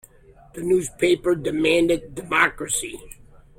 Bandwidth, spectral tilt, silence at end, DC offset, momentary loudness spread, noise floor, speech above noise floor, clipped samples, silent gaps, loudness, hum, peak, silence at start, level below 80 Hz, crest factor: 16.5 kHz; -3.5 dB/octave; 0.45 s; under 0.1%; 13 LU; -50 dBFS; 28 dB; under 0.1%; none; -21 LUFS; none; -6 dBFS; 0.55 s; -48 dBFS; 18 dB